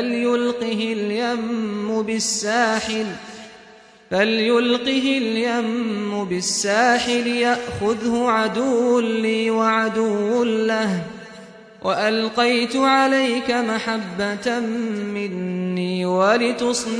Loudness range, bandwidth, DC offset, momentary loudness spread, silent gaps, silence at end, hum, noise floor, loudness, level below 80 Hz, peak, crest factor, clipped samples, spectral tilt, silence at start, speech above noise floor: 3 LU; 11 kHz; under 0.1%; 8 LU; none; 0 s; none; -47 dBFS; -20 LUFS; -58 dBFS; -6 dBFS; 14 dB; under 0.1%; -4 dB/octave; 0 s; 27 dB